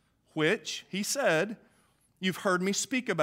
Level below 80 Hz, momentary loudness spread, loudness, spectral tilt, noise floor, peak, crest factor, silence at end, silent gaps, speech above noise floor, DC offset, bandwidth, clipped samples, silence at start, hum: -78 dBFS; 9 LU; -30 LUFS; -3.5 dB/octave; -67 dBFS; -12 dBFS; 18 dB; 0 s; none; 38 dB; under 0.1%; 16 kHz; under 0.1%; 0.35 s; none